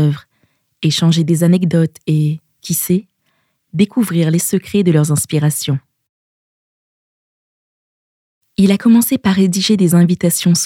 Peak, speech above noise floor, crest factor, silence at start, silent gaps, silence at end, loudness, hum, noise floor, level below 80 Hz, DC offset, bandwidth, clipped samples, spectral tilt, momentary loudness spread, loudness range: 0 dBFS; 51 dB; 14 dB; 0 s; 6.09-8.41 s; 0 s; -14 LUFS; none; -64 dBFS; -56 dBFS; under 0.1%; 16.5 kHz; under 0.1%; -5.5 dB/octave; 9 LU; 7 LU